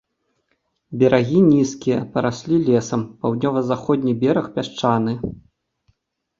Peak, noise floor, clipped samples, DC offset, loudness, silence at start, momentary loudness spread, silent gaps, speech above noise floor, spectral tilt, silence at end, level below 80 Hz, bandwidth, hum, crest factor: -2 dBFS; -70 dBFS; under 0.1%; under 0.1%; -19 LUFS; 0.9 s; 10 LU; none; 51 dB; -7 dB/octave; 1.05 s; -52 dBFS; 7.6 kHz; none; 18 dB